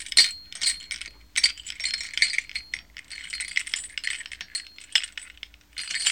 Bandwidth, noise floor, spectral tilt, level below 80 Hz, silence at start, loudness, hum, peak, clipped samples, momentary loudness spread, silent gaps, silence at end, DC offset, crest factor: 19 kHz; -47 dBFS; 3 dB/octave; -58 dBFS; 0 s; -26 LUFS; none; -2 dBFS; under 0.1%; 14 LU; none; 0 s; 0.1%; 26 dB